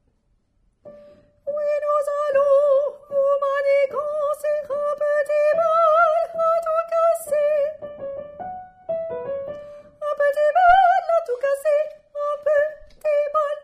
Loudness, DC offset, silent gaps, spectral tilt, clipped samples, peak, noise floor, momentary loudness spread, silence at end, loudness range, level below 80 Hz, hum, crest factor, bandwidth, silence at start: -20 LUFS; under 0.1%; none; -3 dB/octave; under 0.1%; -6 dBFS; -65 dBFS; 15 LU; 0.05 s; 5 LU; -56 dBFS; none; 14 dB; 14.5 kHz; 0.85 s